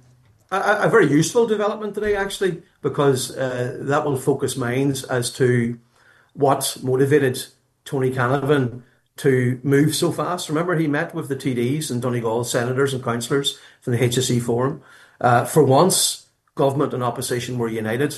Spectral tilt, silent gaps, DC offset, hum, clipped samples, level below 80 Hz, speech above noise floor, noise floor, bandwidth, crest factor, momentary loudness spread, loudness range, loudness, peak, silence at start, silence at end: -5 dB/octave; none; under 0.1%; none; under 0.1%; -58 dBFS; 35 dB; -55 dBFS; 12.5 kHz; 18 dB; 9 LU; 3 LU; -20 LUFS; -2 dBFS; 0.5 s; 0 s